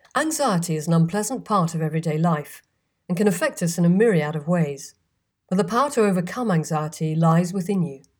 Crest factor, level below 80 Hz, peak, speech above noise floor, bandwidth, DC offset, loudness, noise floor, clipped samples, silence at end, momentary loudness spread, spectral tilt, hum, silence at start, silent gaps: 14 dB; -66 dBFS; -8 dBFS; 52 dB; 19 kHz; under 0.1%; -22 LUFS; -73 dBFS; under 0.1%; 0.2 s; 7 LU; -6 dB/octave; none; 0.15 s; none